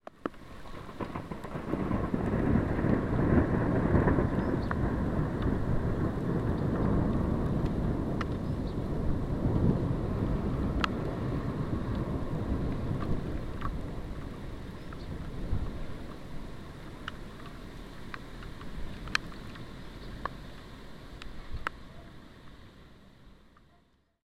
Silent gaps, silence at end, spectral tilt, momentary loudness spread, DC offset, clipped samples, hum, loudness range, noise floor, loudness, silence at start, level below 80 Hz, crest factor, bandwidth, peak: none; 0 s; -8 dB/octave; 17 LU; 0.3%; under 0.1%; none; 15 LU; -67 dBFS; -32 LUFS; 0 s; -40 dBFS; 26 dB; 14 kHz; -6 dBFS